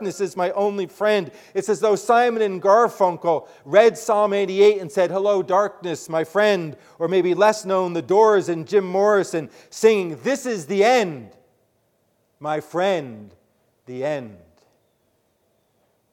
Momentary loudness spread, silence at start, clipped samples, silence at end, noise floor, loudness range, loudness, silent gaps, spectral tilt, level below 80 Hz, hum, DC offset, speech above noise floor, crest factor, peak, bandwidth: 11 LU; 0 s; under 0.1%; 1.75 s; -66 dBFS; 10 LU; -20 LUFS; none; -5 dB/octave; -72 dBFS; none; under 0.1%; 47 dB; 20 dB; -2 dBFS; 15.5 kHz